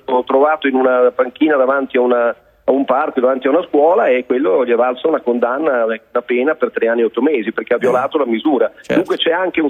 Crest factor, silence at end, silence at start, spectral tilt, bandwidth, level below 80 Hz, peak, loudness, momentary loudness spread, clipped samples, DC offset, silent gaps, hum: 14 dB; 0 s; 0.1 s; -6 dB/octave; 7.2 kHz; -62 dBFS; 0 dBFS; -15 LUFS; 5 LU; under 0.1%; under 0.1%; none; none